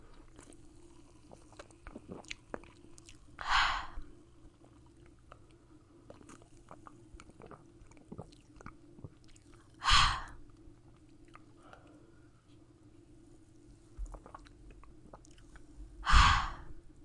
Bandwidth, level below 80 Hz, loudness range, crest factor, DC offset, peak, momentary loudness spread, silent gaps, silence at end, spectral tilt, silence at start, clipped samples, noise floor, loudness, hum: 11.5 kHz; -42 dBFS; 22 LU; 28 dB; under 0.1%; -8 dBFS; 31 LU; none; 0.25 s; -2.5 dB/octave; 1.85 s; under 0.1%; -60 dBFS; -30 LUFS; none